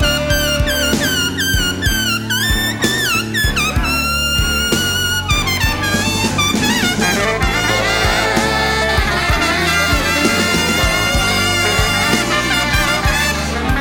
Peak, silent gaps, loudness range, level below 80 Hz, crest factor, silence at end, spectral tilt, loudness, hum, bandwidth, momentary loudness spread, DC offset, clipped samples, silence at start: -2 dBFS; none; 1 LU; -24 dBFS; 14 dB; 0 s; -3 dB/octave; -14 LUFS; none; 19 kHz; 2 LU; under 0.1%; under 0.1%; 0 s